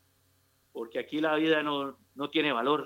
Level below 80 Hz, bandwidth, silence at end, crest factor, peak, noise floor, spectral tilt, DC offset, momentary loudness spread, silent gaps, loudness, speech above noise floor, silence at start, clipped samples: -82 dBFS; 16 kHz; 0 s; 18 dB; -14 dBFS; -69 dBFS; -5.5 dB/octave; under 0.1%; 13 LU; none; -30 LUFS; 40 dB; 0.75 s; under 0.1%